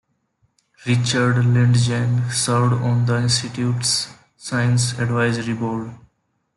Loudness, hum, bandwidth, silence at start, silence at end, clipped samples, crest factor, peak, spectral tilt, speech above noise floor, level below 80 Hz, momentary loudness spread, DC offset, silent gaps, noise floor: -19 LUFS; none; 11.5 kHz; 0.8 s; 0.6 s; under 0.1%; 14 dB; -6 dBFS; -5 dB/octave; 49 dB; -54 dBFS; 9 LU; under 0.1%; none; -67 dBFS